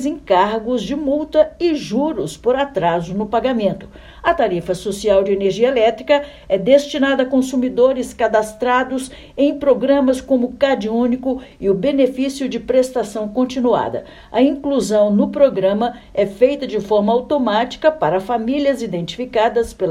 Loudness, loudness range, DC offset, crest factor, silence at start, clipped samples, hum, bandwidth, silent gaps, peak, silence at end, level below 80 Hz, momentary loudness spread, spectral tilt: -17 LUFS; 2 LU; under 0.1%; 16 dB; 0 s; under 0.1%; none; 13.5 kHz; none; 0 dBFS; 0 s; -46 dBFS; 7 LU; -5.5 dB/octave